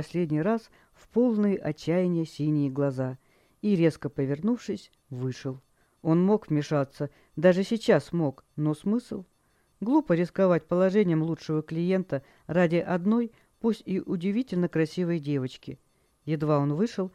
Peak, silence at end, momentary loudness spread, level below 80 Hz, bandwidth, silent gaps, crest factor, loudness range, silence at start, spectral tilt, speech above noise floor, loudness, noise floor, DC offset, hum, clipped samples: -8 dBFS; 0.05 s; 12 LU; -64 dBFS; 11.5 kHz; none; 20 dB; 3 LU; 0 s; -8 dB/octave; 30 dB; -27 LUFS; -56 dBFS; under 0.1%; none; under 0.1%